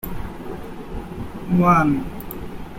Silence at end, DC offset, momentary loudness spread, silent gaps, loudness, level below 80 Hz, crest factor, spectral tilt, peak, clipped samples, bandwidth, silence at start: 0 s; under 0.1%; 18 LU; none; -19 LUFS; -38 dBFS; 20 dB; -8 dB/octave; -2 dBFS; under 0.1%; 16.5 kHz; 0.05 s